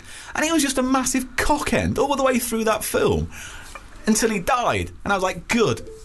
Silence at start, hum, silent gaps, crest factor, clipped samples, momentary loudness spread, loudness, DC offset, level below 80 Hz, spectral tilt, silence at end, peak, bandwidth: 0 s; none; none; 14 dB; under 0.1%; 9 LU; -21 LUFS; under 0.1%; -38 dBFS; -4 dB/octave; 0 s; -8 dBFS; 12.5 kHz